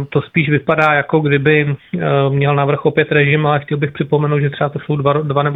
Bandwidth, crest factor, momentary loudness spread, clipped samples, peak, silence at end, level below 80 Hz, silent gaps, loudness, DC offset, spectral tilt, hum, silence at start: 4 kHz; 14 dB; 6 LU; under 0.1%; 0 dBFS; 0 s; -52 dBFS; none; -15 LUFS; under 0.1%; -9 dB/octave; none; 0 s